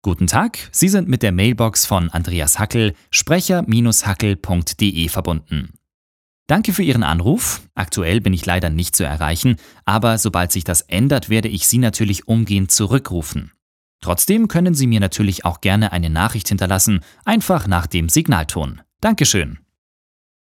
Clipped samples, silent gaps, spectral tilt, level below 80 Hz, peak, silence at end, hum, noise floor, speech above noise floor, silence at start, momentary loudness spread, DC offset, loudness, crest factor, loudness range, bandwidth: under 0.1%; 5.94-6.46 s, 13.62-13.99 s; -4.5 dB/octave; -36 dBFS; 0 dBFS; 0.95 s; none; under -90 dBFS; over 73 dB; 0.05 s; 7 LU; under 0.1%; -17 LUFS; 18 dB; 3 LU; 17.5 kHz